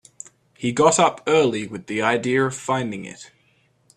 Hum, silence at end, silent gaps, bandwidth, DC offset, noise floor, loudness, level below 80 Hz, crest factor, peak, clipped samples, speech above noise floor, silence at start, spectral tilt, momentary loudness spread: none; 0.7 s; none; 11 kHz; under 0.1%; -62 dBFS; -20 LUFS; -62 dBFS; 20 dB; -2 dBFS; under 0.1%; 41 dB; 0.6 s; -4 dB/octave; 23 LU